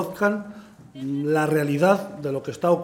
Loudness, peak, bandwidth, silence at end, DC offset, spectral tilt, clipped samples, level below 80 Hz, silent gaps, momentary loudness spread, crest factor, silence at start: -23 LUFS; -6 dBFS; 17 kHz; 0 s; under 0.1%; -7 dB/octave; under 0.1%; -64 dBFS; none; 11 LU; 18 dB; 0 s